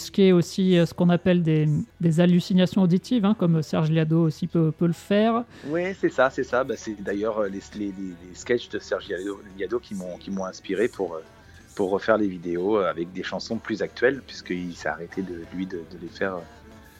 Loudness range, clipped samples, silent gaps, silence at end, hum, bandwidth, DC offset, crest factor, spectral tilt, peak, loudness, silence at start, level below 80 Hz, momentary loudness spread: 8 LU; under 0.1%; none; 0.2 s; none; 12.5 kHz; under 0.1%; 18 dB; -7 dB/octave; -6 dBFS; -24 LUFS; 0 s; -56 dBFS; 13 LU